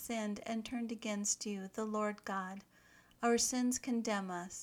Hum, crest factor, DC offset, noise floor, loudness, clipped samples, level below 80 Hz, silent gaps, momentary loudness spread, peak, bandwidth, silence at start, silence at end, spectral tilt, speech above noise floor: none; 18 dB; under 0.1%; -65 dBFS; -37 LUFS; under 0.1%; -72 dBFS; none; 10 LU; -20 dBFS; 19 kHz; 0 s; 0 s; -3 dB/octave; 27 dB